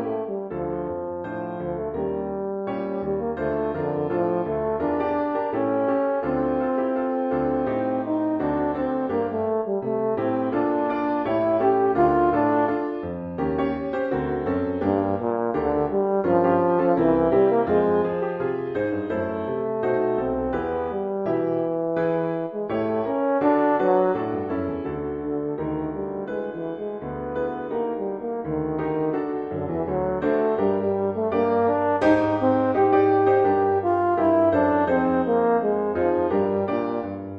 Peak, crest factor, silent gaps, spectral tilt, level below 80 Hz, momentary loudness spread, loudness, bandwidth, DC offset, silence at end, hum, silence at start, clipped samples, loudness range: -6 dBFS; 16 dB; none; -9.5 dB/octave; -50 dBFS; 9 LU; -23 LUFS; 5.6 kHz; under 0.1%; 0 s; none; 0 s; under 0.1%; 7 LU